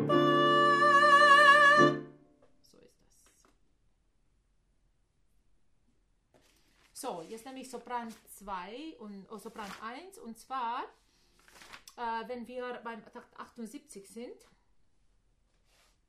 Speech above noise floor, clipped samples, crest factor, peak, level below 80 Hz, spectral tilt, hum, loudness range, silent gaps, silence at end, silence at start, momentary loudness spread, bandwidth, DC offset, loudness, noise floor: 30 dB; under 0.1%; 22 dB; -10 dBFS; -72 dBFS; -4 dB/octave; none; 24 LU; none; 1.75 s; 0 s; 27 LU; 15 kHz; under 0.1%; -24 LUFS; -72 dBFS